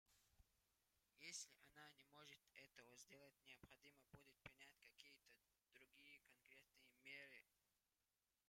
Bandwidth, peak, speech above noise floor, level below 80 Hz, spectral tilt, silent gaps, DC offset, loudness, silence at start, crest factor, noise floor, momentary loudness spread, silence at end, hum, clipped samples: 16 kHz; -42 dBFS; over 20 dB; -90 dBFS; -1 dB/octave; none; under 0.1%; -64 LUFS; 0.05 s; 26 dB; under -90 dBFS; 11 LU; 0.7 s; 50 Hz at -100 dBFS; under 0.1%